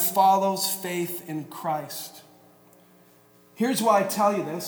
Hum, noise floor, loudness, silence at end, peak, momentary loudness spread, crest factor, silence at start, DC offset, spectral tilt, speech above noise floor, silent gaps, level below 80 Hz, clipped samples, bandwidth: 60 Hz at -65 dBFS; -56 dBFS; -25 LUFS; 0 s; -8 dBFS; 15 LU; 18 dB; 0 s; under 0.1%; -4 dB/octave; 32 dB; none; -80 dBFS; under 0.1%; over 20 kHz